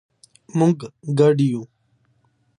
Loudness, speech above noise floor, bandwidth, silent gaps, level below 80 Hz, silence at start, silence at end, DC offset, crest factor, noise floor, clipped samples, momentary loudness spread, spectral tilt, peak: -20 LUFS; 45 dB; 10.5 kHz; none; -66 dBFS; 0.55 s; 0.95 s; under 0.1%; 18 dB; -64 dBFS; under 0.1%; 11 LU; -8 dB/octave; -4 dBFS